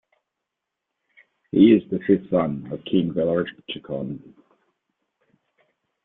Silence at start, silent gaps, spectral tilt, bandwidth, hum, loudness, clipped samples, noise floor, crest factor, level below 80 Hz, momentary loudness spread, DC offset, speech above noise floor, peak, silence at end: 1.55 s; none; -11 dB/octave; 4 kHz; none; -22 LUFS; under 0.1%; -83 dBFS; 20 dB; -60 dBFS; 16 LU; under 0.1%; 62 dB; -4 dBFS; 1.85 s